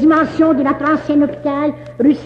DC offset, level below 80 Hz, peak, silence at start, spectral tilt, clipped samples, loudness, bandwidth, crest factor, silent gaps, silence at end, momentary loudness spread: under 0.1%; -48 dBFS; -2 dBFS; 0 s; -7.5 dB/octave; under 0.1%; -15 LUFS; 6.4 kHz; 12 dB; none; 0 s; 6 LU